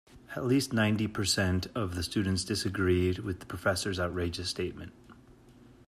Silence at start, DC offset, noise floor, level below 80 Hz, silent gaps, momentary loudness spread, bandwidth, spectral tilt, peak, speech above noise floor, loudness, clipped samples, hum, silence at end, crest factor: 0.15 s; under 0.1%; -56 dBFS; -56 dBFS; none; 9 LU; 14.5 kHz; -5 dB/octave; -14 dBFS; 26 dB; -31 LUFS; under 0.1%; none; 0.35 s; 16 dB